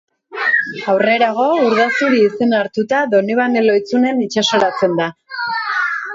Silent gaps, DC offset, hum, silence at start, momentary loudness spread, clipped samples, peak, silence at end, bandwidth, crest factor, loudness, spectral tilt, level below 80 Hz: none; under 0.1%; none; 0.3 s; 6 LU; under 0.1%; -2 dBFS; 0 s; 7.8 kHz; 12 dB; -15 LUFS; -4.5 dB/octave; -64 dBFS